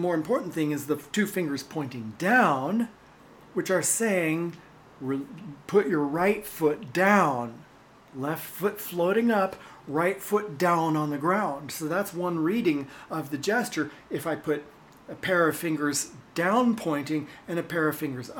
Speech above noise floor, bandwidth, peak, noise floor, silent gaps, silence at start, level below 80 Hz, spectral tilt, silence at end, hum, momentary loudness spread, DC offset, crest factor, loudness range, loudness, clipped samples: 26 dB; 19 kHz; -6 dBFS; -53 dBFS; none; 0 s; -66 dBFS; -5 dB/octave; 0 s; none; 11 LU; under 0.1%; 20 dB; 3 LU; -27 LUFS; under 0.1%